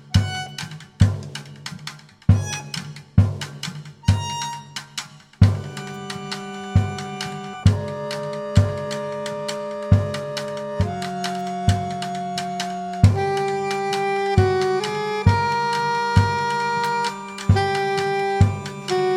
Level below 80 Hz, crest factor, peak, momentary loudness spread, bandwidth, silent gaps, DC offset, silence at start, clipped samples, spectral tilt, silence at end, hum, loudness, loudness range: -38 dBFS; 20 dB; 0 dBFS; 13 LU; 12.5 kHz; none; under 0.1%; 0 s; under 0.1%; -6 dB/octave; 0 s; none; -23 LUFS; 4 LU